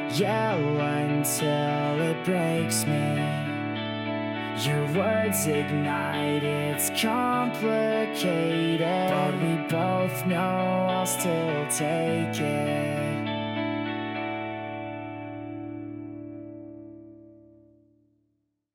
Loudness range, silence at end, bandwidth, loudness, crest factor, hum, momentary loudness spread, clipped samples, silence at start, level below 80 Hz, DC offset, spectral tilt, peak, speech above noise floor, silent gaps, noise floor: 11 LU; 1.4 s; 17.5 kHz; -26 LUFS; 16 dB; none; 12 LU; under 0.1%; 0 s; -66 dBFS; under 0.1%; -5 dB/octave; -10 dBFS; 50 dB; none; -75 dBFS